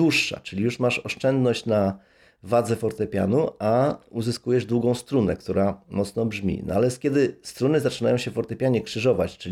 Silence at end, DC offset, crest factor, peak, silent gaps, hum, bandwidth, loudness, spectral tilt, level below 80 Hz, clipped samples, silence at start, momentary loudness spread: 0 s; under 0.1%; 14 dB; -8 dBFS; none; none; 15.5 kHz; -24 LUFS; -6 dB/octave; -54 dBFS; under 0.1%; 0 s; 5 LU